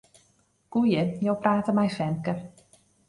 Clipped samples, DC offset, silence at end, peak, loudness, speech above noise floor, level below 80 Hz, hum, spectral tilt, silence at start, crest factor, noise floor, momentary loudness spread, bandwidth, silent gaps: under 0.1%; under 0.1%; 0.6 s; -8 dBFS; -26 LUFS; 41 dB; -62 dBFS; none; -7.5 dB/octave; 0.7 s; 20 dB; -66 dBFS; 9 LU; 11 kHz; none